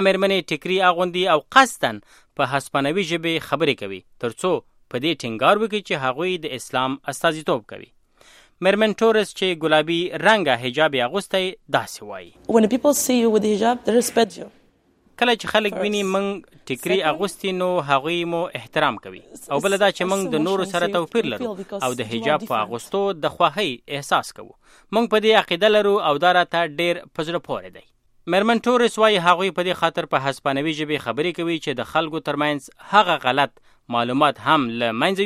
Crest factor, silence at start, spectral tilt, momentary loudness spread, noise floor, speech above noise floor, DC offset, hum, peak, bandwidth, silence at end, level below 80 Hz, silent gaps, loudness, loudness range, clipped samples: 20 dB; 0 s; -4 dB/octave; 10 LU; -59 dBFS; 39 dB; under 0.1%; none; 0 dBFS; 15.5 kHz; 0 s; -60 dBFS; none; -20 LUFS; 4 LU; under 0.1%